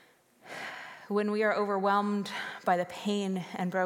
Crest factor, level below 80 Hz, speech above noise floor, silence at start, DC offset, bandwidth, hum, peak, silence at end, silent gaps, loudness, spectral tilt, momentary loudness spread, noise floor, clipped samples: 18 dB; -84 dBFS; 28 dB; 0.45 s; under 0.1%; 16 kHz; none; -14 dBFS; 0 s; none; -31 LUFS; -5.5 dB/octave; 13 LU; -58 dBFS; under 0.1%